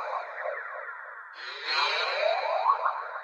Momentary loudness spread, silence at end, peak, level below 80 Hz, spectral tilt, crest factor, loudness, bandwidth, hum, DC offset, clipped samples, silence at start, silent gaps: 14 LU; 0 s; -10 dBFS; under -90 dBFS; 2.5 dB/octave; 20 dB; -29 LUFS; 9 kHz; none; under 0.1%; under 0.1%; 0 s; none